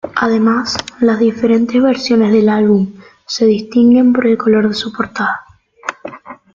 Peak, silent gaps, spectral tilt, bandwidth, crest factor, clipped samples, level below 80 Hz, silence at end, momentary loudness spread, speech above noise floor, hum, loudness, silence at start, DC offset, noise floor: 0 dBFS; none; -5.5 dB/octave; 7.6 kHz; 12 dB; under 0.1%; -52 dBFS; 0.2 s; 15 LU; 19 dB; none; -13 LUFS; 0.05 s; under 0.1%; -31 dBFS